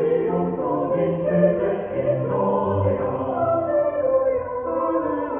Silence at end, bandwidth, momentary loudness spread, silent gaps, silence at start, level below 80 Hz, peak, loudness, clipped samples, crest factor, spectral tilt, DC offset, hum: 0 s; 3.5 kHz; 4 LU; none; 0 s; -52 dBFS; -6 dBFS; -22 LUFS; under 0.1%; 16 dB; -8.5 dB/octave; under 0.1%; none